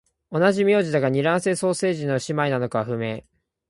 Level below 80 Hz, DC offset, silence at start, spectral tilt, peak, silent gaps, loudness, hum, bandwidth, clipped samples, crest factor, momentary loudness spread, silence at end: -62 dBFS; under 0.1%; 0.3 s; -5.5 dB/octave; -6 dBFS; none; -22 LUFS; none; 11.5 kHz; under 0.1%; 16 dB; 9 LU; 0.5 s